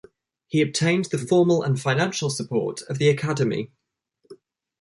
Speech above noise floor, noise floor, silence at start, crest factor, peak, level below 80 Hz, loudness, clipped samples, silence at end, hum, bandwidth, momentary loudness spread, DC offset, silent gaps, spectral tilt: 48 dB; -70 dBFS; 0.55 s; 16 dB; -6 dBFS; -64 dBFS; -23 LUFS; under 0.1%; 0.45 s; none; 11.5 kHz; 7 LU; under 0.1%; none; -5.5 dB/octave